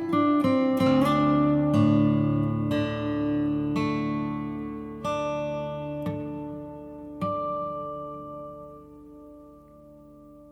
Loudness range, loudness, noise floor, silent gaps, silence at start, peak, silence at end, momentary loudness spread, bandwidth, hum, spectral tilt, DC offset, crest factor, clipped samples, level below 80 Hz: 12 LU; -26 LUFS; -50 dBFS; none; 0 s; -10 dBFS; 0 s; 19 LU; 12.5 kHz; none; -8 dB/octave; under 0.1%; 18 dB; under 0.1%; -52 dBFS